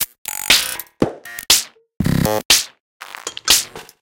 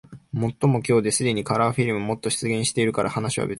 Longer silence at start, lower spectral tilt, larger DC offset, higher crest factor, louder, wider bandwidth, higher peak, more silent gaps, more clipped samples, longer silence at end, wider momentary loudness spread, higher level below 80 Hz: about the same, 0 s vs 0.1 s; second, -2 dB/octave vs -5 dB/octave; neither; about the same, 20 dB vs 16 dB; first, -16 LUFS vs -23 LUFS; first, 17.5 kHz vs 12 kHz; first, 0 dBFS vs -8 dBFS; first, 0.18-0.25 s, 2.45-2.50 s, 2.80-3.00 s vs none; neither; first, 0.2 s vs 0 s; first, 17 LU vs 6 LU; first, -40 dBFS vs -54 dBFS